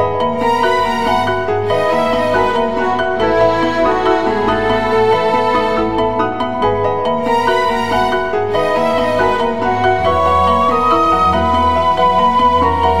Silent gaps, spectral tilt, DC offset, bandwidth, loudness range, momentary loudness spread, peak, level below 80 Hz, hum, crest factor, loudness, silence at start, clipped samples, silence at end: none; -6 dB/octave; 3%; 15 kHz; 2 LU; 4 LU; 0 dBFS; -34 dBFS; none; 12 dB; -14 LUFS; 0 s; under 0.1%; 0 s